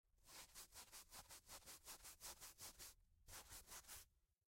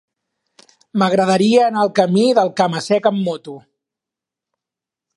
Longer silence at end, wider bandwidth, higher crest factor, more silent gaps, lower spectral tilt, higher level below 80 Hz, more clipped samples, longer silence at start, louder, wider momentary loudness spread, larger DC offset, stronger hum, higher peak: second, 0.3 s vs 1.6 s; first, 16.5 kHz vs 11.5 kHz; about the same, 18 dB vs 16 dB; neither; second, -0.5 dB/octave vs -6 dB/octave; second, -74 dBFS vs -66 dBFS; neither; second, 0.05 s vs 0.95 s; second, -59 LUFS vs -16 LUFS; second, 4 LU vs 11 LU; neither; neither; second, -44 dBFS vs -2 dBFS